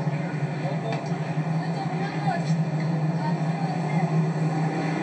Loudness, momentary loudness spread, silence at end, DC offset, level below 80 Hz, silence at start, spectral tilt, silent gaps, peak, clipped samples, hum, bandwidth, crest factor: -26 LUFS; 4 LU; 0 s; under 0.1%; -74 dBFS; 0 s; -7.5 dB/octave; none; -12 dBFS; under 0.1%; none; 8.6 kHz; 14 dB